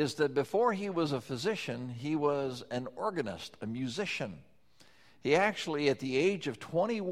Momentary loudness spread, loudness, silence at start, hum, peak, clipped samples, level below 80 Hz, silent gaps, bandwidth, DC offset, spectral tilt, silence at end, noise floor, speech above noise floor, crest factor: 10 LU; -33 LUFS; 0 s; none; -14 dBFS; under 0.1%; -70 dBFS; none; 14 kHz; under 0.1%; -5.5 dB/octave; 0 s; -64 dBFS; 32 dB; 20 dB